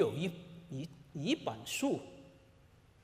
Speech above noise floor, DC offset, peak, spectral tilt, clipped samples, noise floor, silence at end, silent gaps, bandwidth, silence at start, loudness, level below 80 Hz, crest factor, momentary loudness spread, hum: 26 dB; under 0.1%; -18 dBFS; -5 dB/octave; under 0.1%; -63 dBFS; 0.65 s; none; 15.5 kHz; 0 s; -38 LUFS; -70 dBFS; 22 dB; 16 LU; none